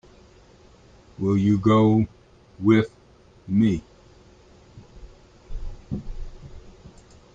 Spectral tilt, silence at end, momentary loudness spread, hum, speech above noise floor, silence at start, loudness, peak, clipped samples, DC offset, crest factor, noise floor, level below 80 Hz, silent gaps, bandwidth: -8.5 dB/octave; 0.65 s; 24 LU; none; 34 dB; 1.2 s; -22 LUFS; -6 dBFS; under 0.1%; under 0.1%; 18 dB; -53 dBFS; -42 dBFS; none; 7.6 kHz